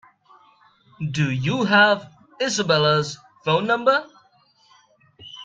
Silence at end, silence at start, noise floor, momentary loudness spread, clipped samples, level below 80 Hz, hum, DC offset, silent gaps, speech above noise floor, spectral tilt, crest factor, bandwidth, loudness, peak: 0 s; 1 s; -59 dBFS; 14 LU; under 0.1%; -62 dBFS; none; under 0.1%; none; 39 dB; -4.5 dB/octave; 20 dB; 9.2 kHz; -20 LUFS; -4 dBFS